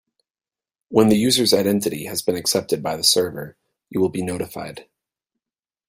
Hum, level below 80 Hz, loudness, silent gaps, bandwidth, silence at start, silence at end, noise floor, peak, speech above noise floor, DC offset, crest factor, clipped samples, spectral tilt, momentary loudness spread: none; -58 dBFS; -20 LUFS; none; 16 kHz; 0.9 s; 1.05 s; under -90 dBFS; -2 dBFS; over 70 dB; under 0.1%; 20 dB; under 0.1%; -4 dB/octave; 14 LU